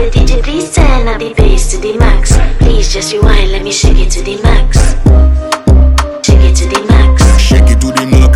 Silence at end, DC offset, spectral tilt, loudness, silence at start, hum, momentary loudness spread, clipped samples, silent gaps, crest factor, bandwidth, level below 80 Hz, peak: 0 s; under 0.1%; -5 dB/octave; -9 LUFS; 0 s; none; 6 LU; 3%; none; 6 dB; 12 kHz; -8 dBFS; 0 dBFS